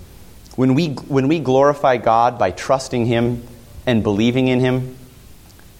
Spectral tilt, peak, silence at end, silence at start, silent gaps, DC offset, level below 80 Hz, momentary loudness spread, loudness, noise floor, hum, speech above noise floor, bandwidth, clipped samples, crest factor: -6.5 dB/octave; -2 dBFS; 0.45 s; 0 s; none; under 0.1%; -44 dBFS; 8 LU; -17 LUFS; -42 dBFS; none; 26 dB; 16.5 kHz; under 0.1%; 16 dB